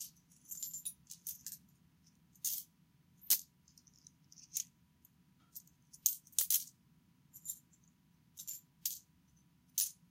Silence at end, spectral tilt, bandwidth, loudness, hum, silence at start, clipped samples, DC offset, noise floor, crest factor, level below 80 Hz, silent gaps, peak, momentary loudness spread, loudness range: 0.2 s; 1.5 dB/octave; 16.5 kHz; -39 LUFS; none; 0 s; under 0.1%; under 0.1%; -70 dBFS; 34 dB; -84 dBFS; none; -10 dBFS; 21 LU; 5 LU